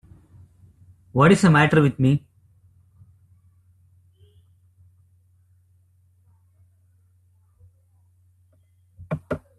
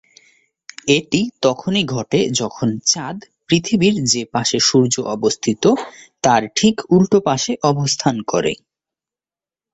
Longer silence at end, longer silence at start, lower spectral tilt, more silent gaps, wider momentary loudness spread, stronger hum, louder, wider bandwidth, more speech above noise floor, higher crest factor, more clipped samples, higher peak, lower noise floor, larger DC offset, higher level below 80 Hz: second, 0.2 s vs 1.2 s; first, 1.15 s vs 0.85 s; first, -7 dB/octave vs -4 dB/octave; neither; first, 16 LU vs 7 LU; neither; about the same, -19 LUFS vs -17 LUFS; first, 12 kHz vs 8.4 kHz; second, 44 dB vs over 73 dB; about the same, 22 dB vs 18 dB; neither; about the same, -2 dBFS vs 0 dBFS; second, -60 dBFS vs under -90 dBFS; neither; about the same, -56 dBFS vs -54 dBFS